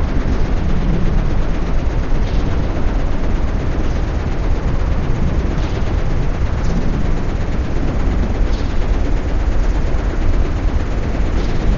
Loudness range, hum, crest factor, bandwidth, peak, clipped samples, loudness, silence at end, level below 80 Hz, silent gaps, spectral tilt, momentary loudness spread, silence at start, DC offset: 0 LU; none; 12 dB; 7.2 kHz; -2 dBFS; under 0.1%; -20 LUFS; 0 s; -16 dBFS; none; -7 dB/octave; 2 LU; 0 s; under 0.1%